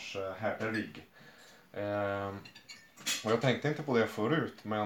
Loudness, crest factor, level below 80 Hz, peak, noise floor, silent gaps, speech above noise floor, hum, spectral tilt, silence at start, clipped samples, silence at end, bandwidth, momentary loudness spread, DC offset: -34 LUFS; 20 dB; -76 dBFS; -14 dBFS; -57 dBFS; none; 24 dB; none; -4.5 dB/octave; 0 s; under 0.1%; 0 s; 19 kHz; 18 LU; under 0.1%